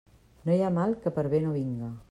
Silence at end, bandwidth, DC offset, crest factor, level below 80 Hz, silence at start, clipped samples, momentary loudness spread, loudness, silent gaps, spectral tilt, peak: 0.05 s; 10.5 kHz; under 0.1%; 16 dB; -60 dBFS; 0.45 s; under 0.1%; 9 LU; -28 LUFS; none; -9.5 dB/octave; -14 dBFS